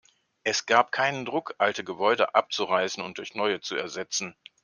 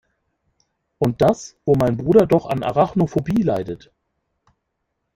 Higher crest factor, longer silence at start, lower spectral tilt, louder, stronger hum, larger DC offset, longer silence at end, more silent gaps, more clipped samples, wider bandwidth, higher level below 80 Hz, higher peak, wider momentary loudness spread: about the same, 22 dB vs 20 dB; second, 0.45 s vs 1 s; second, -2.5 dB/octave vs -8 dB/octave; second, -26 LUFS vs -19 LUFS; neither; neither; second, 0.35 s vs 1.4 s; neither; neither; second, 10.5 kHz vs 16 kHz; second, -76 dBFS vs -48 dBFS; about the same, -4 dBFS vs -2 dBFS; about the same, 9 LU vs 10 LU